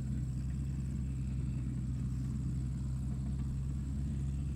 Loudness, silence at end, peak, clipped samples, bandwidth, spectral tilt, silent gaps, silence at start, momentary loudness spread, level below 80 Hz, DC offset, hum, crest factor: -38 LUFS; 0 s; -26 dBFS; under 0.1%; 10 kHz; -8 dB/octave; none; 0 s; 1 LU; -40 dBFS; under 0.1%; none; 10 dB